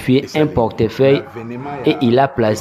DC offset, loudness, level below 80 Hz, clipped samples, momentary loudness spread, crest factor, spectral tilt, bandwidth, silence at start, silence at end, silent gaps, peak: under 0.1%; -16 LUFS; -44 dBFS; under 0.1%; 11 LU; 16 dB; -7 dB/octave; 14.5 kHz; 0 s; 0 s; none; 0 dBFS